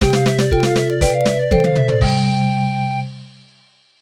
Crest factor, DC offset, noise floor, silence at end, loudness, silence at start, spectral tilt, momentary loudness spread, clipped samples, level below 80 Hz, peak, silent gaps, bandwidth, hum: 16 dB; under 0.1%; -53 dBFS; 0.75 s; -16 LUFS; 0 s; -6 dB/octave; 6 LU; under 0.1%; -28 dBFS; -2 dBFS; none; 15 kHz; none